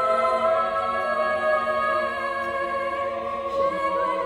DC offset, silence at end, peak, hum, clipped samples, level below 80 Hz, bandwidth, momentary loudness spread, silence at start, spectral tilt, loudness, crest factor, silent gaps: under 0.1%; 0 s; -10 dBFS; none; under 0.1%; -56 dBFS; 12.5 kHz; 6 LU; 0 s; -4.5 dB/octave; -24 LUFS; 14 dB; none